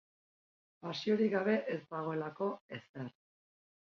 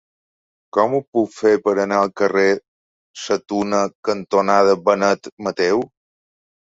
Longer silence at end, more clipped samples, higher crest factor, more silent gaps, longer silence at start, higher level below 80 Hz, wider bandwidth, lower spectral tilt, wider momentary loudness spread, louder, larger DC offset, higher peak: about the same, 0.85 s vs 0.8 s; neither; about the same, 18 dB vs 18 dB; second, 2.61-2.69 s, 2.89-2.94 s vs 1.08-1.13 s, 2.68-3.14 s, 3.95-4.03 s, 5.32-5.37 s; about the same, 0.85 s vs 0.75 s; second, -82 dBFS vs -62 dBFS; second, 6.8 kHz vs 8 kHz; about the same, -5 dB/octave vs -5 dB/octave; first, 16 LU vs 8 LU; second, -36 LUFS vs -18 LUFS; neither; second, -20 dBFS vs -2 dBFS